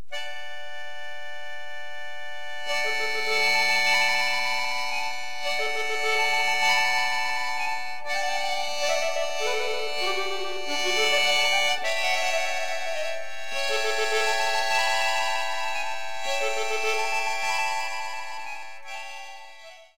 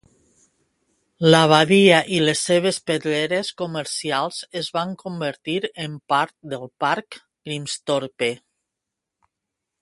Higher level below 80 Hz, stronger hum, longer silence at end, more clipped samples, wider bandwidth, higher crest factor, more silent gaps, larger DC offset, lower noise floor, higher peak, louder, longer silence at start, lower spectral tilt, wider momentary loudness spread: about the same, -66 dBFS vs -64 dBFS; neither; second, 0 s vs 1.45 s; neither; first, 17 kHz vs 11.5 kHz; second, 16 dB vs 22 dB; neither; first, 4% vs under 0.1%; second, -47 dBFS vs -83 dBFS; second, -10 dBFS vs 0 dBFS; second, -25 LUFS vs -20 LUFS; second, 0 s vs 1.2 s; second, 0 dB/octave vs -4.5 dB/octave; about the same, 17 LU vs 16 LU